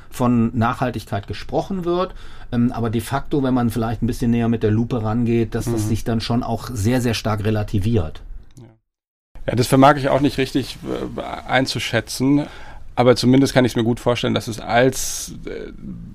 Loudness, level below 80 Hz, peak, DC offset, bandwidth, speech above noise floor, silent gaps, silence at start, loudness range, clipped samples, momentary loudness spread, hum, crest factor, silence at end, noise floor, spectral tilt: -20 LUFS; -36 dBFS; -2 dBFS; under 0.1%; 15.5 kHz; 28 dB; 9.08-9.35 s; 0.05 s; 4 LU; under 0.1%; 13 LU; none; 18 dB; 0 s; -47 dBFS; -6 dB/octave